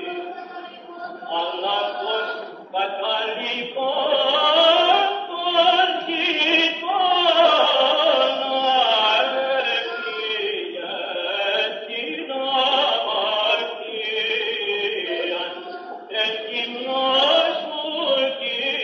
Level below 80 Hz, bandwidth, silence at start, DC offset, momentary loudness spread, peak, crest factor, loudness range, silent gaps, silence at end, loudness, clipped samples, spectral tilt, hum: -88 dBFS; 7 kHz; 0 s; under 0.1%; 12 LU; -4 dBFS; 18 dB; 7 LU; none; 0 s; -20 LUFS; under 0.1%; -2.5 dB/octave; none